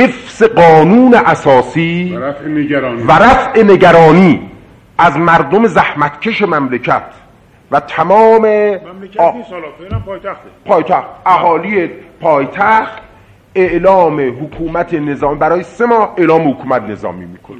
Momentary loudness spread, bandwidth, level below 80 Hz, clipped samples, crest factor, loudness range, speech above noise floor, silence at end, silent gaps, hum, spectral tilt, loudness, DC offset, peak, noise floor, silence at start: 16 LU; 9.4 kHz; -38 dBFS; 0.6%; 10 dB; 6 LU; 33 dB; 0 s; none; none; -7 dB/octave; -10 LUFS; under 0.1%; 0 dBFS; -43 dBFS; 0 s